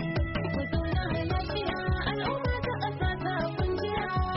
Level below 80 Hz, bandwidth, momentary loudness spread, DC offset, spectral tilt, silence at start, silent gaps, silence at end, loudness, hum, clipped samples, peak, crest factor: -36 dBFS; 5.8 kHz; 1 LU; under 0.1%; -5 dB/octave; 0 s; none; 0 s; -30 LUFS; none; under 0.1%; -18 dBFS; 12 dB